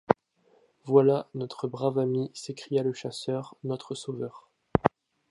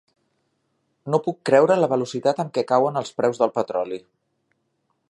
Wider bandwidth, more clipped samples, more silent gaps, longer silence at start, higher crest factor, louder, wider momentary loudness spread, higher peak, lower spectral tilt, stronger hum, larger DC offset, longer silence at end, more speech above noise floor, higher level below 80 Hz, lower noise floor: about the same, 11.5 kHz vs 11.5 kHz; neither; neither; second, 0.1 s vs 1.05 s; first, 28 dB vs 20 dB; second, -29 LUFS vs -21 LUFS; first, 14 LU vs 10 LU; about the same, -2 dBFS vs -4 dBFS; about the same, -6.5 dB/octave vs -6 dB/octave; neither; neither; second, 0.4 s vs 1.1 s; second, 37 dB vs 51 dB; first, -56 dBFS vs -74 dBFS; second, -65 dBFS vs -72 dBFS